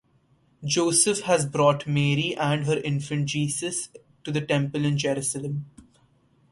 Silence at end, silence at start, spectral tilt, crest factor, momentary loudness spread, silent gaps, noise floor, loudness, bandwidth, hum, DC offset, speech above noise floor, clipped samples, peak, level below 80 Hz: 0.7 s; 0.6 s; -4.5 dB/octave; 20 dB; 11 LU; none; -63 dBFS; -24 LUFS; 11.5 kHz; none; under 0.1%; 39 dB; under 0.1%; -6 dBFS; -62 dBFS